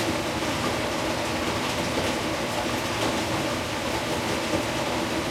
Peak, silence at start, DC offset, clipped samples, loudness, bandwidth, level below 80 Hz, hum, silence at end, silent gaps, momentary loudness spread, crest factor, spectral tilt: -12 dBFS; 0 s; under 0.1%; under 0.1%; -26 LUFS; 16.5 kHz; -46 dBFS; none; 0 s; none; 1 LU; 16 dB; -4 dB/octave